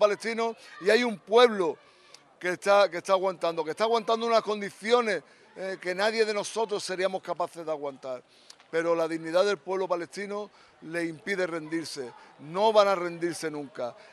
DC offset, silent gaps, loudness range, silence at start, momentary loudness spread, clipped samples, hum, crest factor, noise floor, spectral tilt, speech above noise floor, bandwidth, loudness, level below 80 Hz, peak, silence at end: under 0.1%; none; 5 LU; 0 s; 14 LU; under 0.1%; none; 20 dB; -54 dBFS; -3.5 dB/octave; 27 dB; 13 kHz; -28 LUFS; -84 dBFS; -8 dBFS; 0.2 s